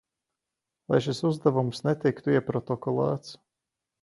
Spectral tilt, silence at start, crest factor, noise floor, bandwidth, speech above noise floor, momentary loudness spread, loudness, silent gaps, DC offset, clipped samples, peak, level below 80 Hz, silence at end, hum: -7 dB/octave; 0.9 s; 20 dB; -87 dBFS; 11.5 kHz; 61 dB; 6 LU; -27 LUFS; none; under 0.1%; under 0.1%; -8 dBFS; -66 dBFS; 0.7 s; none